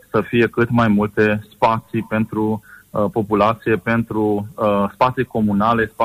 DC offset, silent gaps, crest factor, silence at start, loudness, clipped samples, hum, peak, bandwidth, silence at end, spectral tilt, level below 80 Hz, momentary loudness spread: under 0.1%; none; 14 dB; 0.15 s; -18 LUFS; under 0.1%; none; -4 dBFS; 15.5 kHz; 0 s; -8 dB/octave; -46 dBFS; 6 LU